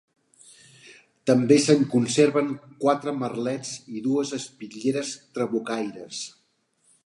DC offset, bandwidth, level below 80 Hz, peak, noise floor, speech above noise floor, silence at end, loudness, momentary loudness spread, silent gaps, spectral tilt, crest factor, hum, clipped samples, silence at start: under 0.1%; 11.5 kHz; -72 dBFS; -4 dBFS; -68 dBFS; 45 dB; 0.75 s; -24 LUFS; 15 LU; none; -5 dB/octave; 22 dB; none; under 0.1%; 0.9 s